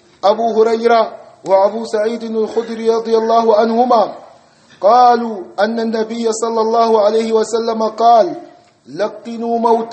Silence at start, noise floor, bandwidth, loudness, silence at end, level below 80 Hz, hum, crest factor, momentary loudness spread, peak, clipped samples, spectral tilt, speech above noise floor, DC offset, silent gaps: 0.25 s; -46 dBFS; 8.8 kHz; -14 LUFS; 0 s; -68 dBFS; none; 14 dB; 11 LU; 0 dBFS; under 0.1%; -4.5 dB/octave; 32 dB; under 0.1%; none